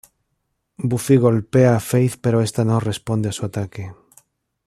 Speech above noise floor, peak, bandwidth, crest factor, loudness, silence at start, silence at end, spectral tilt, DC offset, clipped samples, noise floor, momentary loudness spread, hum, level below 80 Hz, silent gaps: 55 dB; -2 dBFS; 14.5 kHz; 18 dB; -19 LUFS; 0.8 s; 0.75 s; -7 dB/octave; under 0.1%; under 0.1%; -73 dBFS; 12 LU; none; -54 dBFS; none